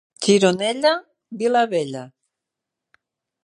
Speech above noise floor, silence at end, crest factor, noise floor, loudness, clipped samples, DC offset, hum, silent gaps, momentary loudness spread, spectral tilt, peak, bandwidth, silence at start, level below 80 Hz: 65 dB; 1.35 s; 20 dB; -84 dBFS; -20 LUFS; under 0.1%; under 0.1%; none; none; 14 LU; -4 dB/octave; -2 dBFS; 11 kHz; 0.2 s; -72 dBFS